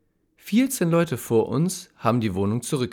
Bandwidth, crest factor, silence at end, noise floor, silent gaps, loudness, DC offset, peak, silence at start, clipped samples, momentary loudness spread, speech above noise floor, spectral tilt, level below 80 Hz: 19.5 kHz; 18 dB; 0 s; -48 dBFS; none; -23 LUFS; under 0.1%; -6 dBFS; 0.45 s; under 0.1%; 5 LU; 25 dB; -6 dB/octave; -62 dBFS